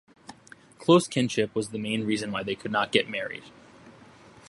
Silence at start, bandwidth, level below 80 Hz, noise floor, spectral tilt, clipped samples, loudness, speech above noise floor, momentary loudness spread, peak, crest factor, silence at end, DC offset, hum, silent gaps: 0.3 s; 11.5 kHz; -66 dBFS; -52 dBFS; -5 dB/octave; under 0.1%; -26 LUFS; 26 dB; 12 LU; -4 dBFS; 24 dB; 0.6 s; under 0.1%; none; none